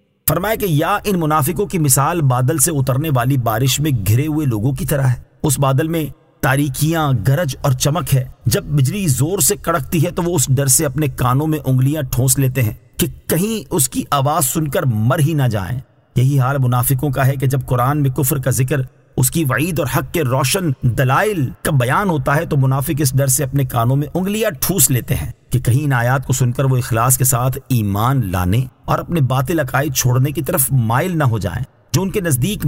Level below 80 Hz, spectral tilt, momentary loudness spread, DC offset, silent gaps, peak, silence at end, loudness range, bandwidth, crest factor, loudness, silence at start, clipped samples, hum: -38 dBFS; -5 dB/octave; 5 LU; under 0.1%; none; 0 dBFS; 0 s; 2 LU; 16.5 kHz; 16 dB; -16 LUFS; 0.25 s; under 0.1%; none